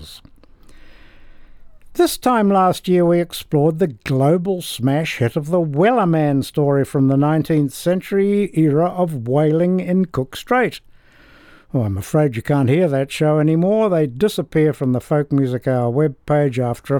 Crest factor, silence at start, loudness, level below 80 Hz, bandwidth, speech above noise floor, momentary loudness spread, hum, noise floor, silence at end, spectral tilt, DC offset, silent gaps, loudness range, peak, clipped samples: 14 dB; 0 s; -18 LUFS; -50 dBFS; 19 kHz; 31 dB; 5 LU; none; -47 dBFS; 0 s; -7 dB/octave; under 0.1%; none; 3 LU; -2 dBFS; under 0.1%